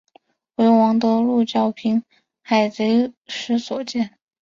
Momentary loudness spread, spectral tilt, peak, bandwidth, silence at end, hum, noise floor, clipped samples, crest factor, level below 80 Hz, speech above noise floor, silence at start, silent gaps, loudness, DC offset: 10 LU; -6 dB/octave; -4 dBFS; 7.4 kHz; 0.35 s; none; -57 dBFS; under 0.1%; 16 dB; -66 dBFS; 37 dB; 0.6 s; 3.17-3.21 s; -20 LUFS; under 0.1%